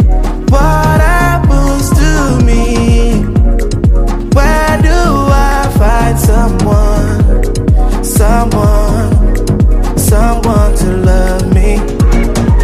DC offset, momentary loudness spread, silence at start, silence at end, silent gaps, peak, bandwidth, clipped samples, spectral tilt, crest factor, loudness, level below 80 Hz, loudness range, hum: under 0.1%; 2 LU; 0 s; 0 s; none; 0 dBFS; 15 kHz; under 0.1%; -6.5 dB/octave; 8 dB; -10 LUFS; -10 dBFS; 1 LU; none